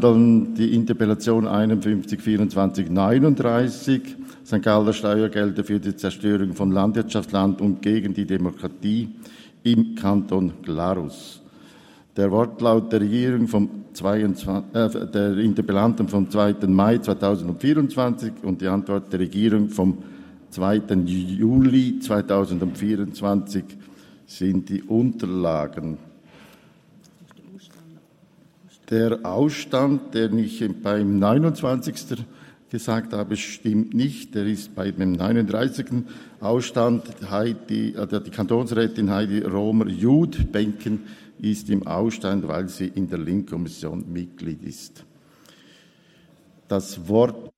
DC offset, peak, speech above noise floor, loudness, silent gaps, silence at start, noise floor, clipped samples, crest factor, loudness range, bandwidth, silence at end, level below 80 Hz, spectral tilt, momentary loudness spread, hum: under 0.1%; -4 dBFS; 34 dB; -22 LUFS; none; 0 s; -55 dBFS; under 0.1%; 18 dB; 7 LU; 14.5 kHz; 0.1 s; -48 dBFS; -7 dB/octave; 11 LU; none